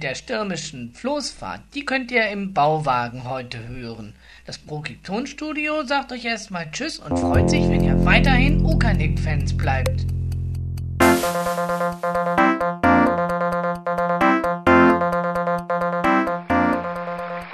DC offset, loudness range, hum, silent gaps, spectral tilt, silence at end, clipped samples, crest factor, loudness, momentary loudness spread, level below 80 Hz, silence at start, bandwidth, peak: under 0.1%; 8 LU; none; none; -6 dB/octave; 0 s; under 0.1%; 20 dB; -21 LUFS; 13 LU; -32 dBFS; 0 s; 13.5 kHz; -2 dBFS